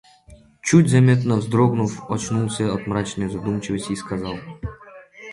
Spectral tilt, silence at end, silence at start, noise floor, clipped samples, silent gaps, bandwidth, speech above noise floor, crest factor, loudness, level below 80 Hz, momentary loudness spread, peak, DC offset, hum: -6.5 dB/octave; 0 s; 0.3 s; -49 dBFS; under 0.1%; none; 11.5 kHz; 29 dB; 18 dB; -21 LUFS; -48 dBFS; 16 LU; -2 dBFS; under 0.1%; none